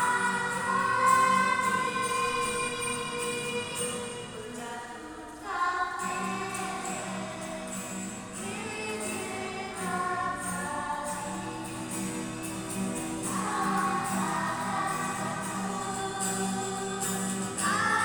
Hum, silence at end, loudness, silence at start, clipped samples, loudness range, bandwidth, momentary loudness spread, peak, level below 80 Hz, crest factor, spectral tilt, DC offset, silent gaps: none; 0 s; -30 LUFS; 0 s; under 0.1%; 7 LU; over 20 kHz; 10 LU; -12 dBFS; -60 dBFS; 20 dB; -3 dB/octave; under 0.1%; none